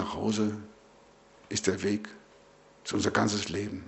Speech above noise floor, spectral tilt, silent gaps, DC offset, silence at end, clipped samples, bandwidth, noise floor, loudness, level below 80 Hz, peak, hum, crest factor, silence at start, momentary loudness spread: 28 dB; -4 dB/octave; none; under 0.1%; 0 s; under 0.1%; 8.4 kHz; -58 dBFS; -30 LUFS; -62 dBFS; -10 dBFS; none; 22 dB; 0 s; 16 LU